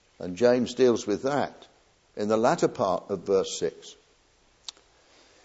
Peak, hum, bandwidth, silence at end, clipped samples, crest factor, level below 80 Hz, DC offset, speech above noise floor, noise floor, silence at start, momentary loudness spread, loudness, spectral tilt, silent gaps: -8 dBFS; none; 8 kHz; 1.5 s; under 0.1%; 20 dB; -66 dBFS; under 0.1%; 37 dB; -63 dBFS; 0.2 s; 20 LU; -26 LUFS; -5 dB/octave; none